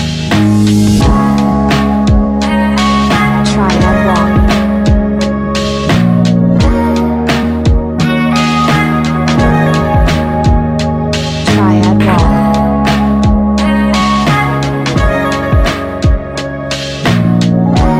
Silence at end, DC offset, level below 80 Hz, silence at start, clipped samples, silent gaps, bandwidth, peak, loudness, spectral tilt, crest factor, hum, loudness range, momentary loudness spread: 0 s; under 0.1%; -18 dBFS; 0 s; under 0.1%; none; 14.5 kHz; 0 dBFS; -10 LUFS; -6.5 dB/octave; 10 dB; none; 2 LU; 5 LU